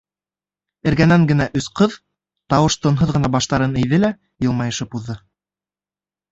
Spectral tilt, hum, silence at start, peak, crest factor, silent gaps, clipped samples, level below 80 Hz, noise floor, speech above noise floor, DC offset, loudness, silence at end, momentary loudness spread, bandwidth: -6 dB/octave; none; 0.85 s; -2 dBFS; 18 dB; none; under 0.1%; -42 dBFS; under -90 dBFS; over 73 dB; under 0.1%; -18 LUFS; 1.15 s; 11 LU; 8 kHz